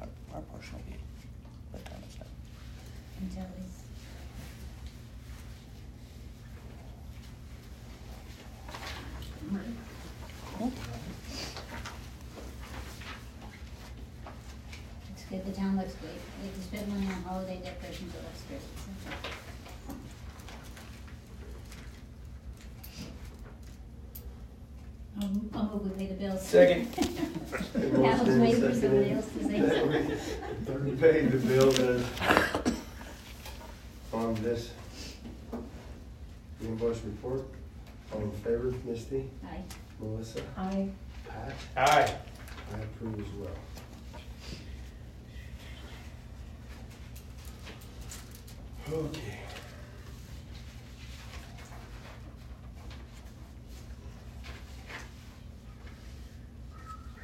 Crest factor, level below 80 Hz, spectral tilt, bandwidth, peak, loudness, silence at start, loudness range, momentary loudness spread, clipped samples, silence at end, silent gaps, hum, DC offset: 28 dB; -48 dBFS; -5.5 dB/octave; 16 kHz; -6 dBFS; -32 LUFS; 0 s; 20 LU; 22 LU; under 0.1%; 0 s; none; none; under 0.1%